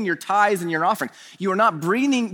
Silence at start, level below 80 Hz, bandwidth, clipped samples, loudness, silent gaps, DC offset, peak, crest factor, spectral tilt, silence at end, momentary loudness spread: 0 s; -76 dBFS; over 20 kHz; under 0.1%; -21 LUFS; none; under 0.1%; -6 dBFS; 16 dB; -5 dB/octave; 0 s; 8 LU